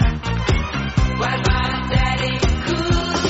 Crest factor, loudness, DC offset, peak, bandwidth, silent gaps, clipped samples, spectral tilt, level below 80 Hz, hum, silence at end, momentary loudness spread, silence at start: 14 dB; -20 LUFS; under 0.1%; -6 dBFS; 8 kHz; none; under 0.1%; -4.5 dB/octave; -24 dBFS; none; 0 s; 2 LU; 0 s